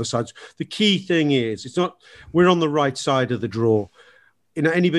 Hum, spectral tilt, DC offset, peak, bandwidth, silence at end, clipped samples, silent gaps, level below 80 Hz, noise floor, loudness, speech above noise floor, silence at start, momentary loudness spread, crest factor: none; -5.5 dB/octave; under 0.1%; -4 dBFS; 11.5 kHz; 0 s; under 0.1%; none; -56 dBFS; -56 dBFS; -21 LUFS; 35 dB; 0 s; 14 LU; 18 dB